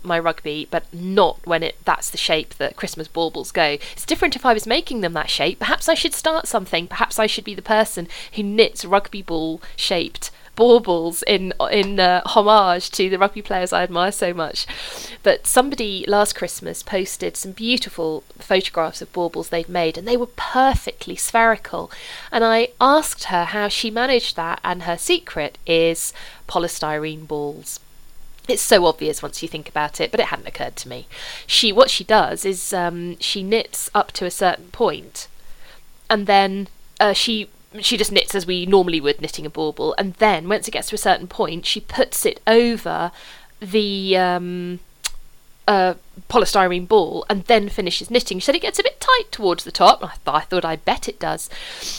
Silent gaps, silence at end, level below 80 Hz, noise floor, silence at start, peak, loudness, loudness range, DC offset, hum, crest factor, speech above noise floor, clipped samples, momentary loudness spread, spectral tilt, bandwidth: none; 0 s; -42 dBFS; -40 dBFS; 0 s; 0 dBFS; -19 LUFS; 4 LU; under 0.1%; none; 20 dB; 20 dB; under 0.1%; 12 LU; -3 dB/octave; 19 kHz